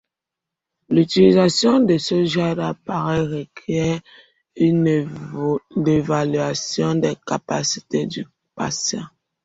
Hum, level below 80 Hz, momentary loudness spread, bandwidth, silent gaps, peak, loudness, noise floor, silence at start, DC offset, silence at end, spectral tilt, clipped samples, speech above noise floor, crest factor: none; -52 dBFS; 13 LU; 8 kHz; none; -2 dBFS; -20 LUFS; -85 dBFS; 0.9 s; under 0.1%; 0.35 s; -5.5 dB/octave; under 0.1%; 66 dB; 18 dB